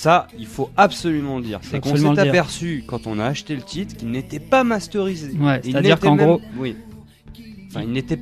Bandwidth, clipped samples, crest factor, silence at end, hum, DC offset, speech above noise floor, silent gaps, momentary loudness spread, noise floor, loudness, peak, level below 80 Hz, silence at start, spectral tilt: 14 kHz; under 0.1%; 18 dB; 0 s; none; under 0.1%; 22 dB; none; 13 LU; -41 dBFS; -20 LUFS; -2 dBFS; -46 dBFS; 0 s; -6 dB/octave